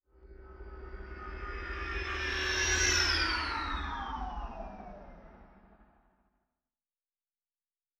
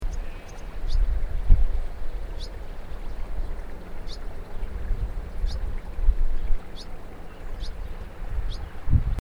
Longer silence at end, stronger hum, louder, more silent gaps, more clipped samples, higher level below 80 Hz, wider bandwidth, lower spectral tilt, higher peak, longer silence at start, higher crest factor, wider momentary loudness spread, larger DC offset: first, 2.15 s vs 0 s; neither; about the same, -32 LUFS vs -33 LUFS; neither; neither; second, -44 dBFS vs -26 dBFS; first, 13.5 kHz vs 6.8 kHz; second, -2 dB/octave vs -6.5 dB/octave; second, -16 dBFS vs -4 dBFS; first, 0.2 s vs 0 s; about the same, 22 dB vs 20 dB; first, 23 LU vs 15 LU; neither